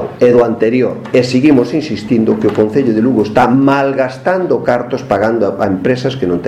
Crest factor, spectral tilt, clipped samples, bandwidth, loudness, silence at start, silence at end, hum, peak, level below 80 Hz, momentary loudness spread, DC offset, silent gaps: 12 dB; -7 dB/octave; 0.1%; 11 kHz; -12 LUFS; 0 s; 0 s; none; 0 dBFS; -46 dBFS; 6 LU; under 0.1%; none